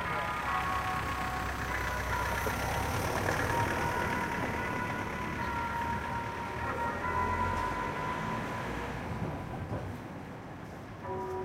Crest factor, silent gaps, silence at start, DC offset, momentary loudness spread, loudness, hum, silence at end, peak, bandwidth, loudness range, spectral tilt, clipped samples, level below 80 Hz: 16 dB; none; 0 s; under 0.1%; 8 LU; -34 LUFS; none; 0 s; -16 dBFS; 16 kHz; 5 LU; -5 dB/octave; under 0.1%; -46 dBFS